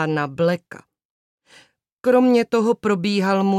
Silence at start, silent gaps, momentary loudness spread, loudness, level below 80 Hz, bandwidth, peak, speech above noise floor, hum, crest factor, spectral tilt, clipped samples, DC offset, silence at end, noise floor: 0 s; 1.05-1.38 s, 1.92-1.97 s; 7 LU; -19 LUFS; -66 dBFS; 14 kHz; -4 dBFS; 35 dB; none; 16 dB; -6.5 dB/octave; under 0.1%; under 0.1%; 0 s; -54 dBFS